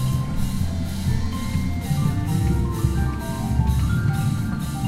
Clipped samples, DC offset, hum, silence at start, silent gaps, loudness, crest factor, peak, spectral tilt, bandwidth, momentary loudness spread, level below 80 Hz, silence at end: under 0.1%; under 0.1%; none; 0 s; none; -23 LUFS; 14 dB; -8 dBFS; -6.5 dB/octave; 16 kHz; 4 LU; -28 dBFS; 0 s